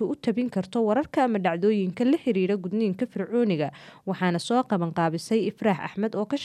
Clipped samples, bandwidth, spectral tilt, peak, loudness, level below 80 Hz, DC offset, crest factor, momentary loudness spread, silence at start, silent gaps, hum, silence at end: under 0.1%; 12.5 kHz; -7 dB/octave; -10 dBFS; -26 LUFS; -68 dBFS; under 0.1%; 14 dB; 5 LU; 0 s; none; none; 0 s